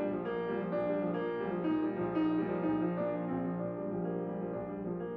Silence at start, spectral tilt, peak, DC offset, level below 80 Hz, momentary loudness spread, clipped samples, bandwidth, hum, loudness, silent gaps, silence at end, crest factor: 0 s; -10.5 dB/octave; -22 dBFS; under 0.1%; -64 dBFS; 6 LU; under 0.1%; 4.8 kHz; none; -35 LUFS; none; 0 s; 12 dB